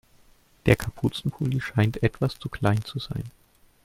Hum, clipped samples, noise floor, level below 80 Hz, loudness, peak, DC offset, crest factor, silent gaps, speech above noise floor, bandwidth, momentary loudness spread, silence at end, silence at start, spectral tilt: none; under 0.1%; -58 dBFS; -46 dBFS; -26 LUFS; -2 dBFS; under 0.1%; 24 dB; none; 32 dB; 16 kHz; 10 LU; 0.55 s; 0.65 s; -7 dB/octave